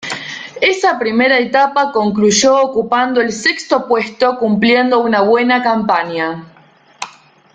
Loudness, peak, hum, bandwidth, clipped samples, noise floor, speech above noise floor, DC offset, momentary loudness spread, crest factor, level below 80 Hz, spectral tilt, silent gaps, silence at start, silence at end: -13 LUFS; -2 dBFS; none; 9.4 kHz; under 0.1%; -40 dBFS; 27 dB; under 0.1%; 12 LU; 12 dB; -56 dBFS; -3.5 dB/octave; none; 0 s; 0.45 s